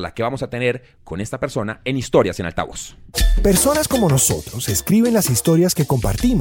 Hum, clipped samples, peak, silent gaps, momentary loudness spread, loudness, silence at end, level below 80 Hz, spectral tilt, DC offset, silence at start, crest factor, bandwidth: none; under 0.1%; -2 dBFS; none; 11 LU; -18 LUFS; 0 s; -26 dBFS; -4.5 dB/octave; under 0.1%; 0 s; 16 dB; 17 kHz